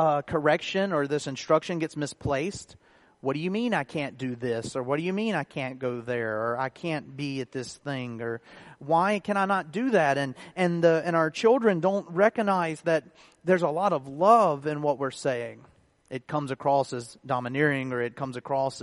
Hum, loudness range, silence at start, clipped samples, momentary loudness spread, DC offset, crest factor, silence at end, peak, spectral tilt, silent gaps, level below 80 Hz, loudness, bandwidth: none; 6 LU; 0 s; under 0.1%; 11 LU; under 0.1%; 20 dB; 0 s; -6 dBFS; -6 dB/octave; none; -62 dBFS; -27 LUFS; 11.5 kHz